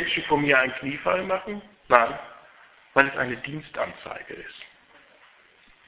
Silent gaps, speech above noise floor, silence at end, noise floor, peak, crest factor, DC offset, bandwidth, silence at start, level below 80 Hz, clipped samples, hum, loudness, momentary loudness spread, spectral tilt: none; 32 dB; 1.2 s; -57 dBFS; 0 dBFS; 26 dB; under 0.1%; 4 kHz; 0 s; -60 dBFS; under 0.1%; none; -24 LUFS; 19 LU; -8 dB/octave